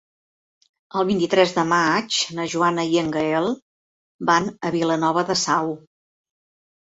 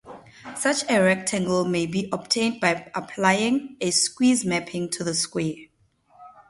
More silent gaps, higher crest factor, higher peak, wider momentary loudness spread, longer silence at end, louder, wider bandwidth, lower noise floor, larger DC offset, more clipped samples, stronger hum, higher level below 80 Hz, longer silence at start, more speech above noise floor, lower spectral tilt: first, 3.62-4.19 s vs none; about the same, 20 dB vs 20 dB; about the same, -4 dBFS vs -4 dBFS; about the same, 8 LU vs 9 LU; first, 1.1 s vs 0.2 s; about the same, -21 LUFS vs -23 LUFS; second, 8 kHz vs 11.5 kHz; first, under -90 dBFS vs -61 dBFS; neither; neither; neither; about the same, -62 dBFS vs -62 dBFS; first, 0.95 s vs 0.05 s; first, over 69 dB vs 38 dB; about the same, -4 dB/octave vs -3.5 dB/octave